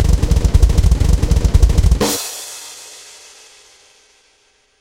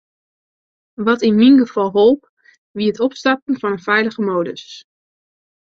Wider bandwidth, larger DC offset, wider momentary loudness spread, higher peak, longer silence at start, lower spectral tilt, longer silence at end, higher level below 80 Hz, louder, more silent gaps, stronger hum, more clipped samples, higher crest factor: first, 16.5 kHz vs 7.4 kHz; neither; first, 20 LU vs 12 LU; about the same, 0 dBFS vs -2 dBFS; second, 0 s vs 1 s; about the same, -5.5 dB/octave vs -6 dB/octave; first, 1.85 s vs 0.9 s; first, -16 dBFS vs -62 dBFS; about the same, -15 LUFS vs -16 LUFS; second, none vs 2.29-2.37 s, 2.58-2.74 s, 3.42-3.47 s; neither; neither; about the same, 14 dB vs 16 dB